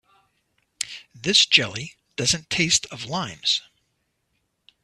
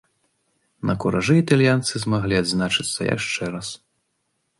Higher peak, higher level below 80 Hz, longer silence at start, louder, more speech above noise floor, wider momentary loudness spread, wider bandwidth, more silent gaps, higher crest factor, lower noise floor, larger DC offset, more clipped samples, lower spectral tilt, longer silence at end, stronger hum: first, 0 dBFS vs -4 dBFS; second, -58 dBFS vs -50 dBFS; about the same, 0.8 s vs 0.85 s; about the same, -21 LUFS vs -21 LUFS; about the same, 51 dB vs 52 dB; first, 16 LU vs 12 LU; first, 13.5 kHz vs 11.5 kHz; neither; first, 26 dB vs 20 dB; about the same, -73 dBFS vs -73 dBFS; neither; neither; second, -1.5 dB/octave vs -5 dB/octave; first, 1.25 s vs 0.85 s; neither